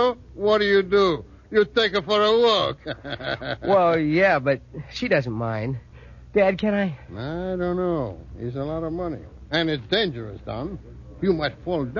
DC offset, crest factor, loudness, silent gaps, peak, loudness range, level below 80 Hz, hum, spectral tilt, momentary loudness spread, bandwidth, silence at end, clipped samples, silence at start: under 0.1%; 16 dB; -23 LUFS; none; -6 dBFS; 6 LU; -46 dBFS; none; -6.5 dB/octave; 14 LU; 7.2 kHz; 0 s; under 0.1%; 0 s